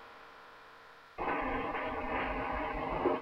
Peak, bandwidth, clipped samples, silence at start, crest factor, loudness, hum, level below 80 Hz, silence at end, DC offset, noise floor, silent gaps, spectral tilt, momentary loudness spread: -18 dBFS; 15 kHz; under 0.1%; 0 s; 20 dB; -36 LUFS; none; -50 dBFS; 0 s; under 0.1%; -56 dBFS; none; -7 dB/octave; 19 LU